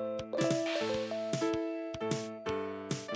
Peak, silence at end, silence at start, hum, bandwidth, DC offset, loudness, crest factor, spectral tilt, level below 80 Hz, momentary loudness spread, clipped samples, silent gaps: -20 dBFS; 0 s; 0 s; none; 8 kHz; under 0.1%; -35 LUFS; 16 dB; -5 dB/octave; -64 dBFS; 6 LU; under 0.1%; none